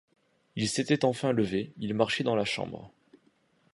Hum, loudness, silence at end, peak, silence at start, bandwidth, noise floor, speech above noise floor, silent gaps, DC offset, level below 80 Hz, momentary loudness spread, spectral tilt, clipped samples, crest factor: none; -29 LUFS; 0.85 s; -10 dBFS; 0.55 s; 11.5 kHz; -68 dBFS; 39 dB; none; under 0.1%; -64 dBFS; 10 LU; -5 dB/octave; under 0.1%; 22 dB